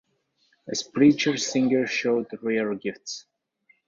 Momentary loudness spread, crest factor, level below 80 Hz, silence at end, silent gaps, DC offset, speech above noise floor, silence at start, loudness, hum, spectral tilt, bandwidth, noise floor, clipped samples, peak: 14 LU; 20 dB; -66 dBFS; 0.65 s; none; under 0.1%; 45 dB; 0.65 s; -24 LUFS; none; -4 dB/octave; 7.6 kHz; -69 dBFS; under 0.1%; -6 dBFS